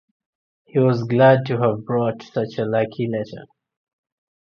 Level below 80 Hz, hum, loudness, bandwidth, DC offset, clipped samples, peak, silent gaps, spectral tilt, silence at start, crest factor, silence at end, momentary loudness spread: -62 dBFS; none; -20 LUFS; 6.6 kHz; under 0.1%; under 0.1%; -2 dBFS; none; -9 dB/octave; 0.75 s; 20 dB; 1 s; 12 LU